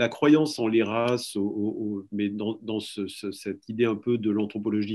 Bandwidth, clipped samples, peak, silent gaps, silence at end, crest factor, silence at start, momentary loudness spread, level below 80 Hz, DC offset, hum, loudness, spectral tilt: 12.5 kHz; under 0.1%; -8 dBFS; none; 0 s; 18 dB; 0 s; 13 LU; -74 dBFS; under 0.1%; none; -27 LUFS; -6 dB/octave